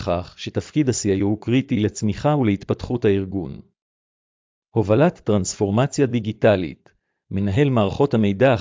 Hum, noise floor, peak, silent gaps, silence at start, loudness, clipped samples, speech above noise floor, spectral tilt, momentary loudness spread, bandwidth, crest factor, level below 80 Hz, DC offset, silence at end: none; under -90 dBFS; -4 dBFS; 3.82-4.62 s; 0 s; -21 LUFS; under 0.1%; over 70 dB; -6.5 dB/octave; 9 LU; 7.6 kHz; 16 dB; -44 dBFS; under 0.1%; 0 s